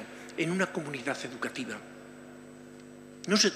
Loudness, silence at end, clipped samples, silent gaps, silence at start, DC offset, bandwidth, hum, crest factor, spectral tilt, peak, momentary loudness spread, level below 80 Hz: -33 LUFS; 0 s; under 0.1%; none; 0 s; under 0.1%; 15 kHz; 50 Hz at -60 dBFS; 24 dB; -3 dB/octave; -10 dBFS; 20 LU; -74 dBFS